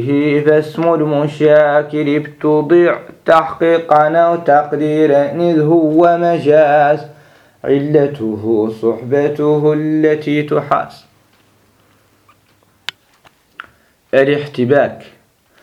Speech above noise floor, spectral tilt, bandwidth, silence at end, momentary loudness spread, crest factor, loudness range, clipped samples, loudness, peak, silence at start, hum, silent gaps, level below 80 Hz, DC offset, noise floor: 41 dB; -8 dB/octave; 9.6 kHz; 0.6 s; 7 LU; 14 dB; 9 LU; under 0.1%; -13 LUFS; 0 dBFS; 0 s; none; none; -60 dBFS; under 0.1%; -54 dBFS